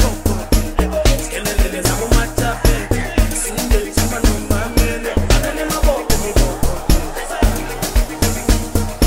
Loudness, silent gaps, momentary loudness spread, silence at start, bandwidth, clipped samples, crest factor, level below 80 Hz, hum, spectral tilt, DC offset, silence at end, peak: -18 LUFS; none; 3 LU; 0 s; 16.5 kHz; under 0.1%; 14 dB; -18 dBFS; none; -4.5 dB/octave; under 0.1%; 0 s; -2 dBFS